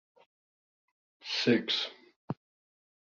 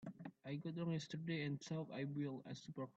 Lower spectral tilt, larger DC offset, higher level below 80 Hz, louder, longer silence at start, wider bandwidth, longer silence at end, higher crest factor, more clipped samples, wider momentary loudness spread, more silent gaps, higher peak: second, -3 dB/octave vs -6.5 dB/octave; neither; first, -78 dBFS vs -84 dBFS; first, -30 LUFS vs -47 LUFS; first, 1.25 s vs 0 s; about the same, 7.4 kHz vs 7.8 kHz; first, 0.7 s vs 0.05 s; first, 24 dB vs 14 dB; neither; first, 16 LU vs 8 LU; first, 2.16-2.28 s vs none; first, -12 dBFS vs -32 dBFS